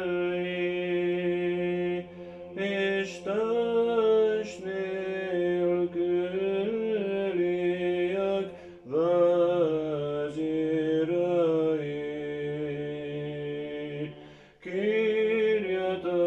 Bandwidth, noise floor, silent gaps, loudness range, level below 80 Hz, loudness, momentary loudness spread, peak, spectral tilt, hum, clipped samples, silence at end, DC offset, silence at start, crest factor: 8.2 kHz; -50 dBFS; none; 3 LU; -68 dBFS; -28 LUFS; 10 LU; -14 dBFS; -7 dB/octave; none; under 0.1%; 0 s; under 0.1%; 0 s; 14 dB